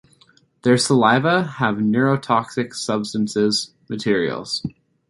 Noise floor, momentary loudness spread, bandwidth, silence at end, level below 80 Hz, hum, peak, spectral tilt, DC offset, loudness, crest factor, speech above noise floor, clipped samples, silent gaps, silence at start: -56 dBFS; 11 LU; 11.5 kHz; 0.4 s; -58 dBFS; none; -2 dBFS; -5 dB/octave; under 0.1%; -20 LUFS; 18 dB; 37 dB; under 0.1%; none; 0.65 s